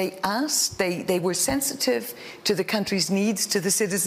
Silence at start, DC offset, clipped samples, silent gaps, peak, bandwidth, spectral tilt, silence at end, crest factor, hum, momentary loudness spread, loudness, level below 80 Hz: 0 s; under 0.1%; under 0.1%; none; -10 dBFS; 16 kHz; -3 dB/octave; 0 s; 14 dB; none; 4 LU; -24 LUFS; -56 dBFS